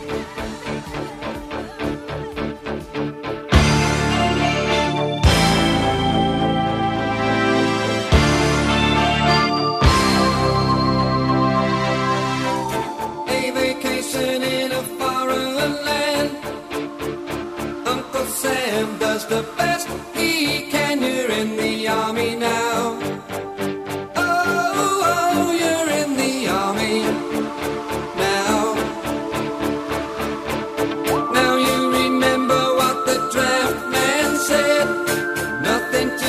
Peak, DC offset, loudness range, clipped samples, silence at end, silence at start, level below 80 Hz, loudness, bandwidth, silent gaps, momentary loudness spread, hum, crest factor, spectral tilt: -2 dBFS; under 0.1%; 6 LU; under 0.1%; 0 s; 0 s; -34 dBFS; -20 LUFS; 15.5 kHz; none; 11 LU; none; 18 dB; -4.5 dB/octave